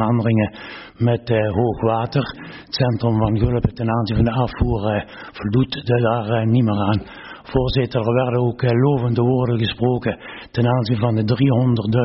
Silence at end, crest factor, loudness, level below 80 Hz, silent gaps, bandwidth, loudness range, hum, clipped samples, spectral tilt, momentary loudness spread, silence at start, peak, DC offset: 0 s; 14 dB; -19 LUFS; -36 dBFS; none; 6 kHz; 1 LU; none; under 0.1%; -6.5 dB/octave; 8 LU; 0 s; -4 dBFS; under 0.1%